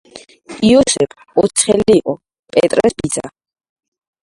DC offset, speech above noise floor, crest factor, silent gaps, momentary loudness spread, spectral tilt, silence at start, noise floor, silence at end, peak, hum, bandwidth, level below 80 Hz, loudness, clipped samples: under 0.1%; 23 dB; 16 dB; 2.39-2.43 s; 13 LU; -4 dB/octave; 0.15 s; -36 dBFS; 0.95 s; 0 dBFS; none; 11.5 kHz; -46 dBFS; -14 LUFS; under 0.1%